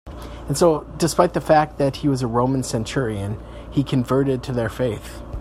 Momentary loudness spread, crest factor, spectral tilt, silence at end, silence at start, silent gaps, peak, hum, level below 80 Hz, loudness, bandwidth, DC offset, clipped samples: 12 LU; 18 dB; -6 dB/octave; 0 s; 0.05 s; none; -2 dBFS; none; -40 dBFS; -21 LUFS; 15.5 kHz; under 0.1%; under 0.1%